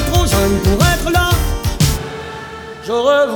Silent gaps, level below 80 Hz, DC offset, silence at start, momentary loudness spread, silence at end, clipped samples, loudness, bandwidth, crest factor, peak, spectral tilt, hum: none; -22 dBFS; under 0.1%; 0 s; 15 LU; 0 s; under 0.1%; -15 LUFS; over 20 kHz; 14 dB; 0 dBFS; -5 dB/octave; none